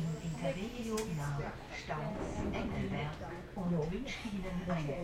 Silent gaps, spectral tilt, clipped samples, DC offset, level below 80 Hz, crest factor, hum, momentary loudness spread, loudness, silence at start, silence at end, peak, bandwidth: none; -6 dB/octave; under 0.1%; under 0.1%; -50 dBFS; 14 dB; none; 5 LU; -39 LUFS; 0 s; 0 s; -24 dBFS; 16 kHz